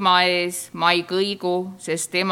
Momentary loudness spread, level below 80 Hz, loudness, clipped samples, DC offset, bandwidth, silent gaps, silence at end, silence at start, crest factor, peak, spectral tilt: 9 LU; -74 dBFS; -21 LUFS; under 0.1%; under 0.1%; 16.5 kHz; none; 0 s; 0 s; 20 dB; -2 dBFS; -3 dB/octave